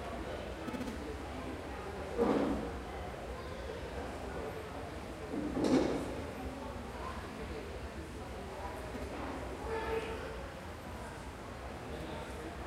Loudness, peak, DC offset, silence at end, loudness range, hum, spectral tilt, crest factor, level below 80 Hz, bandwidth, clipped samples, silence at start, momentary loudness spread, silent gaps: -40 LUFS; -18 dBFS; under 0.1%; 0 s; 5 LU; none; -6 dB/octave; 22 dB; -50 dBFS; 16 kHz; under 0.1%; 0 s; 12 LU; none